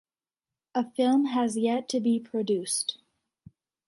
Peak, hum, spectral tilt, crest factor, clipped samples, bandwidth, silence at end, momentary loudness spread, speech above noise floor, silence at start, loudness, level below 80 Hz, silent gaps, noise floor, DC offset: -14 dBFS; none; -4 dB/octave; 16 dB; under 0.1%; 11.5 kHz; 0.95 s; 7 LU; over 64 dB; 0.75 s; -27 LUFS; -76 dBFS; none; under -90 dBFS; under 0.1%